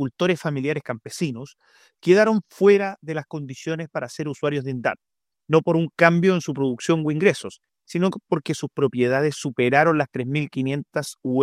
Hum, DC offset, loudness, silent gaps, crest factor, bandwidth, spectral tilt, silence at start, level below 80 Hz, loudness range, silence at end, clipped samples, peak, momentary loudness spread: none; under 0.1%; -22 LUFS; none; 20 dB; 14 kHz; -6 dB/octave; 0 s; -68 dBFS; 2 LU; 0 s; under 0.1%; -2 dBFS; 13 LU